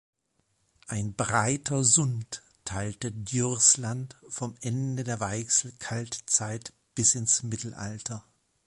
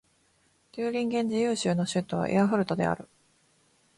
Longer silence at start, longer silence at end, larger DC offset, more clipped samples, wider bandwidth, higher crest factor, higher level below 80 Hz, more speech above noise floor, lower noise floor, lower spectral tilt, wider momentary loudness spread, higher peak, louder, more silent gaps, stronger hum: first, 0.9 s vs 0.75 s; second, 0.45 s vs 0.95 s; neither; neither; about the same, 11.5 kHz vs 11.5 kHz; first, 24 dB vs 16 dB; first, -58 dBFS vs -64 dBFS; first, 45 dB vs 40 dB; first, -74 dBFS vs -67 dBFS; second, -3 dB/octave vs -6 dB/octave; first, 16 LU vs 8 LU; first, -6 dBFS vs -12 dBFS; about the same, -26 LUFS vs -28 LUFS; neither; neither